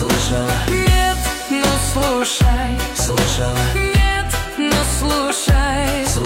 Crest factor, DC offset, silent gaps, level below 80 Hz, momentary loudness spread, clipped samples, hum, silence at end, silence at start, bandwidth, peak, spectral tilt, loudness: 14 dB; under 0.1%; none; -22 dBFS; 4 LU; under 0.1%; none; 0 s; 0 s; 16.5 kHz; -4 dBFS; -4 dB/octave; -17 LUFS